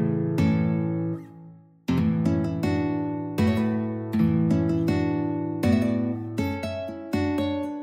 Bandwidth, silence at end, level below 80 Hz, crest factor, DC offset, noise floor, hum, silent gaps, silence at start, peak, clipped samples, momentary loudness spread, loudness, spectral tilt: 15.5 kHz; 0 s; -52 dBFS; 16 dB; under 0.1%; -48 dBFS; none; none; 0 s; -8 dBFS; under 0.1%; 7 LU; -25 LUFS; -8.5 dB/octave